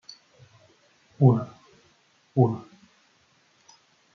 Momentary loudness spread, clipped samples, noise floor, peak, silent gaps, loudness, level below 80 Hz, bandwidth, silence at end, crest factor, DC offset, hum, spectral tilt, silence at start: 20 LU; under 0.1%; -64 dBFS; -6 dBFS; none; -24 LUFS; -70 dBFS; 6.6 kHz; 1.55 s; 24 dB; under 0.1%; none; -10 dB/octave; 1.2 s